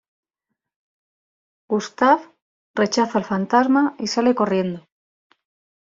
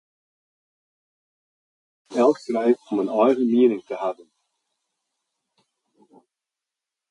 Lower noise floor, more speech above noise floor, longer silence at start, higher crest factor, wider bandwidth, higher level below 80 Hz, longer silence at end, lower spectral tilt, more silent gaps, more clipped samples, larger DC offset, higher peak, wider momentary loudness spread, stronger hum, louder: second, -82 dBFS vs -87 dBFS; second, 63 dB vs 67 dB; second, 1.7 s vs 2.1 s; about the same, 20 dB vs 20 dB; second, 7.6 kHz vs 10.5 kHz; first, -66 dBFS vs -76 dBFS; second, 1.05 s vs 3 s; second, -5 dB/octave vs -6.5 dB/octave; first, 2.42-2.74 s vs none; neither; neither; about the same, -4 dBFS vs -6 dBFS; second, 8 LU vs 11 LU; neither; about the same, -20 LUFS vs -21 LUFS